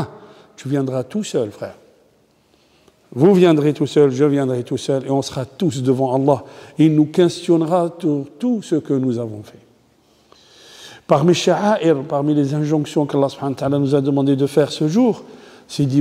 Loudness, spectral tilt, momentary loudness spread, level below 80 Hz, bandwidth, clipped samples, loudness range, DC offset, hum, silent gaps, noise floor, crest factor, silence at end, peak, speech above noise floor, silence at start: -18 LUFS; -7 dB/octave; 12 LU; -62 dBFS; 14 kHz; under 0.1%; 4 LU; under 0.1%; none; none; -57 dBFS; 18 dB; 0 s; 0 dBFS; 40 dB; 0 s